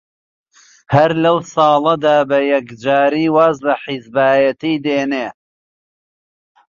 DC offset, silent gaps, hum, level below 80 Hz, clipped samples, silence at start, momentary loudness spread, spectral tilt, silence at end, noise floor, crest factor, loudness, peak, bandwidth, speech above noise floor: under 0.1%; none; none; -56 dBFS; under 0.1%; 0.9 s; 7 LU; -6.5 dB/octave; 1.4 s; under -90 dBFS; 14 dB; -15 LUFS; -2 dBFS; 7.4 kHz; over 76 dB